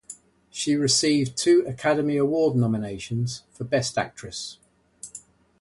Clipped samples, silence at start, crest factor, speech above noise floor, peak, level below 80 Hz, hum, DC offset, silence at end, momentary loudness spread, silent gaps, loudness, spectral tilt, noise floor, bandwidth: under 0.1%; 0.1 s; 16 dB; 24 dB; -8 dBFS; -58 dBFS; none; under 0.1%; 0.4 s; 20 LU; none; -24 LUFS; -4.5 dB/octave; -48 dBFS; 11.5 kHz